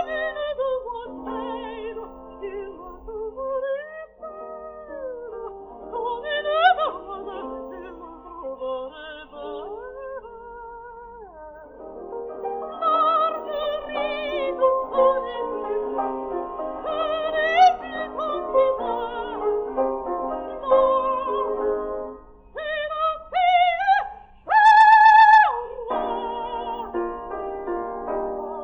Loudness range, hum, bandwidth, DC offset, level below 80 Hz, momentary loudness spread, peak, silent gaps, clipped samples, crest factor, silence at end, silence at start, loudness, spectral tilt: 18 LU; none; 8.4 kHz; under 0.1%; -52 dBFS; 20 LU; -4 dBFS; none; under 0.1%; 18 dB; 0 s; 0 s; -22 LUFS; -4 dB/octave